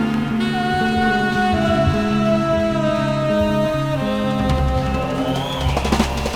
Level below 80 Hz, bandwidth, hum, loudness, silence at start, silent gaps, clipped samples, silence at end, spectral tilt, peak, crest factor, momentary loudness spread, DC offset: -30 dBFS; 16 kHz; none; -19 LUFS; 0 s; none; under 0.1%; 0 s; -6 dB/octave; -2 dBFS; 16 dB; 4 LU; under 0.1%